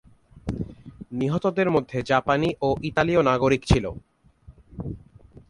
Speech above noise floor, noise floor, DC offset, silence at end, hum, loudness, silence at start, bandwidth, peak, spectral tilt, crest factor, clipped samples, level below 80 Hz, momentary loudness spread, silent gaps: 30 dB; -52 dBFS; under 0.1%; 0.5 s; none; -23 LUFS; 0.35 s; 11.5 kHz; -4 dBFS; -6.5 dB/octave; 22 dB; under 0.1%; -40 dBFS; 17 LU; none